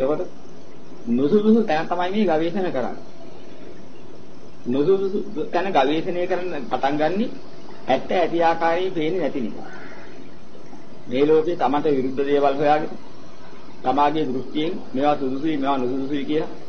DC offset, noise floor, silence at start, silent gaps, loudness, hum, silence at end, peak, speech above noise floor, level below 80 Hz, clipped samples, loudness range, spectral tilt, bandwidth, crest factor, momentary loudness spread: 5%; -44 dBFS; 0 s; none; -22 LUFS; none; 0 s; -6 dBFS; 22 dB; -60 dBFS; under 0.1%; 3 LU; -7 dB/octave; 6.6 kHz; 16 dB; 22 LU